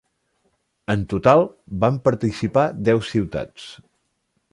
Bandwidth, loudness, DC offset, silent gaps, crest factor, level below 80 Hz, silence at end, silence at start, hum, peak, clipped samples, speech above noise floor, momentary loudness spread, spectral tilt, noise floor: 11.5 kHz; -20 LUFS; under 0.1%; none; 20 dB; -46 dBFS; 0.75 s; 0.9 s; none; -2 dBFS; under 0.1%; 51 dB; 18 LU; -7.5 dB/octave; -71 dBFS